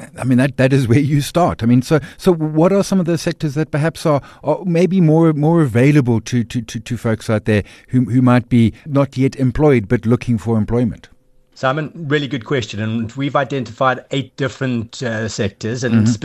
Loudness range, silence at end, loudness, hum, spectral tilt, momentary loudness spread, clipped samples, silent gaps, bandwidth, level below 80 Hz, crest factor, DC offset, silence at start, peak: 5 LU; 0.05 s; -16 LUFS; none; -7 dB/octave; 9 LU; under 0.1%; none; 13 kHz; -40 dBFS; 14 dB; under 0.1%; 0 s; -2 dBFS